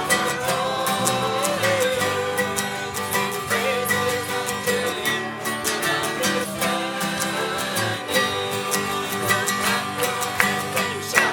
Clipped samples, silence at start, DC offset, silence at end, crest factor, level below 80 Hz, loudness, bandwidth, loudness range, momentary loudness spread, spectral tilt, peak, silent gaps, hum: under 0.1%; 0 s; under 0.1%; 0 s; 22 dB; -58 dBFS; -22 LUFS; 19 kHz; 1 LU; 4 LU; -2.5 dB/octave; 0 dBFS; none; none